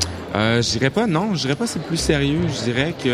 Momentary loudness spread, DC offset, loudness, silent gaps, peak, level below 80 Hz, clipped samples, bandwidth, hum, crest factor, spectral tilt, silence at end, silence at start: 4 LU; under 0.1%; -20 LUFS; none; -2 dBFS; -40 dBFS; under 0.1%; 15 kHz; none; 18 dB; -4.5 dB/octave; 0 s; 0 s